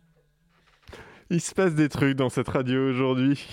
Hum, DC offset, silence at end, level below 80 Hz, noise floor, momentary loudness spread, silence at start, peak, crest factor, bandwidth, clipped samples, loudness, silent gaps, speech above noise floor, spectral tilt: none; under 0.1%; 0 s; -56 dBFS; -64 dBFS; 4 LU; 0.9 s; -8 dBFS; 16 dB; 15 kHz; under 0.1%; -25 LUFS; none; 41 dB; -6 dB/octave